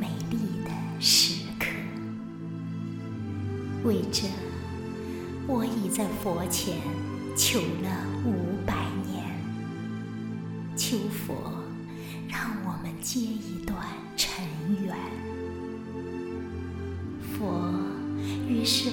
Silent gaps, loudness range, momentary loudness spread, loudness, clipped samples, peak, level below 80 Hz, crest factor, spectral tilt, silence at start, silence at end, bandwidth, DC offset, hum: none; 6 LU; 11 LU; -30 LUFS; under 0.1%; -8 dBFS; -54 dBFS; 22 dB; -4 dB/octave; 0 s; 0 s; 17.5 kHz; under 0.1%; none